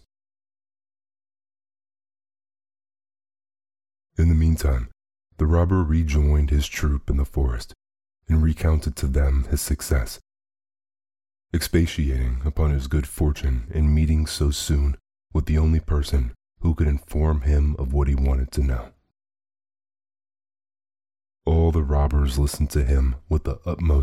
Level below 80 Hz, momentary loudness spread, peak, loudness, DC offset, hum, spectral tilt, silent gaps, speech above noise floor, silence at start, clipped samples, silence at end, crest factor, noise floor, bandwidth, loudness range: -24 dBFS; 7 LU; -8 dBFS; -23 LUFS; under 0.1%; none; -6.5 dB/octave; none; over 70 dB; 4.2 s; under 0.1%; 0 s; 14 dB; under -90 dBFS; 14 kHz; 4 LU